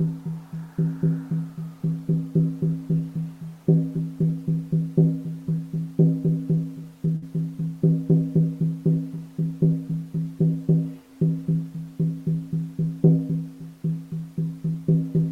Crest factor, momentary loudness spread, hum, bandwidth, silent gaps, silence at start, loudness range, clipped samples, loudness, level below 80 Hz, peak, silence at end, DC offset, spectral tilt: 20 dB; 10 LU; none; 1.9 kHz; none; 0 s; 2 LU; under 0.1%; -25 LUFS; -58 dBFS; -4 dBFS; 0 s; under 0.1%; -11 dB/octave